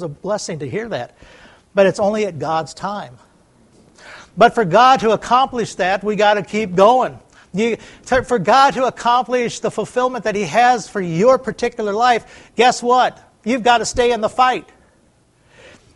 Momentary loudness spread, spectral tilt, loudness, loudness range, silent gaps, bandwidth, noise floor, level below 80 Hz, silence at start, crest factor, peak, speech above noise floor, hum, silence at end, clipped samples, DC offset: 13 LU; -4.5 dB/octave; -16 LUFS; 6 LU; none; 11.5 kHz; -55 dBFS; -48 dBFS; 0 s; 18 dB; 0 dBFS; 39 dB; none; 1.35 s; under 0.1%; under 0.1%